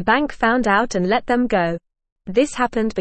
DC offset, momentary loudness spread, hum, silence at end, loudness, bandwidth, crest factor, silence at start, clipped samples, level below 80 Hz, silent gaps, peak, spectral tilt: 0.6%; 6 LU; none; 0 s; -19 LUFS; 8.8 kHz; 16 dB; 0 s; under 0.1%; -42 dBFS; 2.12-2.16 s; -4 dBFS; -5 dB/octave